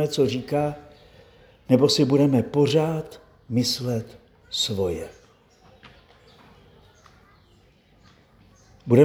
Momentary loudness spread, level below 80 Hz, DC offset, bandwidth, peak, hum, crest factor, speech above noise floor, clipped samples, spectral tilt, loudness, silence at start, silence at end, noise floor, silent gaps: 20 LU; -56 dBFS; under 0.1%; over 20 kHz; -4 dBFS; none; 22 dB; 35 dB; under 0.1%; -6 dB/octave; -23 LUFS; 0 s; 0 s; -57 dBFS; none